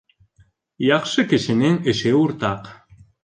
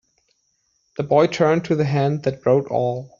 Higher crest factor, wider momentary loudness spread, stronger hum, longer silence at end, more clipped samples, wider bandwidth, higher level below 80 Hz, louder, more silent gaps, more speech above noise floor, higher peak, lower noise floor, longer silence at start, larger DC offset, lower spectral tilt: about the same, 16 dB vs 18 dB; about the same, 7 LU vs 6 LU; neither; first, 0.5 s vs 0.15 s; neither; first, 9.8 kHz vs 7.4 kHz; about the same, -54 dBFS vs -58 dBFS; about the same, -19 LUFS vs -19 LUFS; neither; second, 39 dB vs 49 dB; about the same, -4 dBFS vs -2 dBFS; second, -58 dBFS vs -68 dBFS; second, 0.8 s vs 1 s; neither; about the same, -5.5 dB/octave vs -6.5 dB/octave